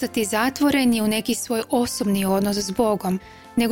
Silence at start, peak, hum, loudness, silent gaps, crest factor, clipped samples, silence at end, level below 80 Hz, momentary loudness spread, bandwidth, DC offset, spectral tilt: 0 s; -8 dBFS; none; -22 LUFS; none; 14 dB; under 0.1%; 0 s; -50 dBFS; 6 LU; 17 kHz; under 0.1%; -4.5 dB/octave